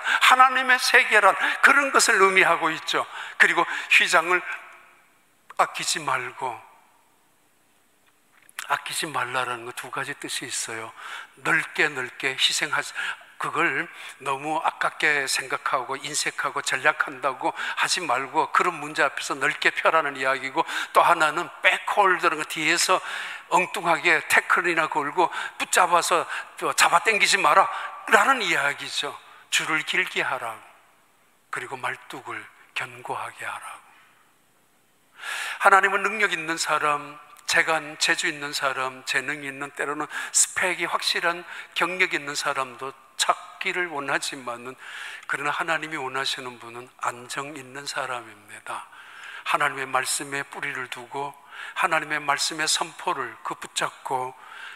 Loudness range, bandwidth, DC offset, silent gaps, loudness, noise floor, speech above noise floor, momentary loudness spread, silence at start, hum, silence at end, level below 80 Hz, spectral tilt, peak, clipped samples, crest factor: 10 LU; 16 kHz; under 0.1%; none; -23 LUFS; -64 dBFS; 39 dB; 17 LU; 0 s; none; 0 s; -78 dBFS; -1 dB/octave; -2 dBFS; under 0.1%; 24 dB